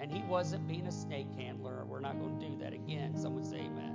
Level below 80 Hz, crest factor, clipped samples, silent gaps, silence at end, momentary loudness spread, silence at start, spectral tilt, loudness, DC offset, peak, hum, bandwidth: -70 dBFS; 16 dB; under 0.1%; none; 0 s; 7 LU; 0 s; -6.5 dB/octave; -40 LUFS; under 0.1%; -22 dBFS; none; 7.6 kHz